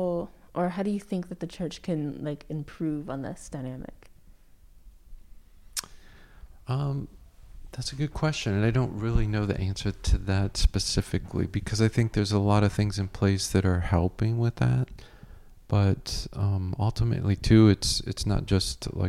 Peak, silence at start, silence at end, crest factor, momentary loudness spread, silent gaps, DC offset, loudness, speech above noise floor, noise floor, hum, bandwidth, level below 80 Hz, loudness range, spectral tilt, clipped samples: -8 dBFS; 0 s; 0 s; 20 dB; 12 LU; none; under 0.1%; -27 LUFS; 27 dB; -53 dBFS; none; 14 kHz; -38 dBFS; 12 LU; -6 dB/octave; under 0.1%